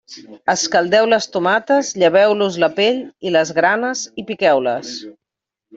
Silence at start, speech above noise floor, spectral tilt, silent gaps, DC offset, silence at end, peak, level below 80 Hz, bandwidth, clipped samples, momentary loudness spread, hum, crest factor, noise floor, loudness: 0.1 s; 67 dB; -3 dB/octave; none; under 0.1%; 0 s; -2 dBFS; -62 dBFS; 8 kHz; under 0.1%; 11 LU; none; 16 dB; -84 dBFS; -16 LUFS